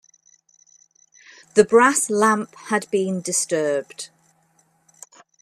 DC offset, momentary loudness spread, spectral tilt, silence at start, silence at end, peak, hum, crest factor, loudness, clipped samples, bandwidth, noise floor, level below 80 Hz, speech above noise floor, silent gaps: under 0.1%; 14 LU; -3.5 dB/octave; 1.55 s; 1.35 s; 0 dBFS; none; 22 dB; -19 LUFS; under 0.1%; 13.5 kHz; -62 dBFS; -70 dBFS; 43 dB; none